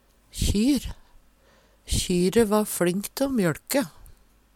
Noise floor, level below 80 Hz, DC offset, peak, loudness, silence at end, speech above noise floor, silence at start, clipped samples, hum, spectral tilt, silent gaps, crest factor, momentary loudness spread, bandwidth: -59 dBFS; -38 dBFS; under 0.1%; -8 dBFS; -24 LUFS; 0.45 s; 35 dB; 0.35 s; under 0.1%; none; -5 dB/octave; none; 18 dB; 8 LU; 17.5 kHz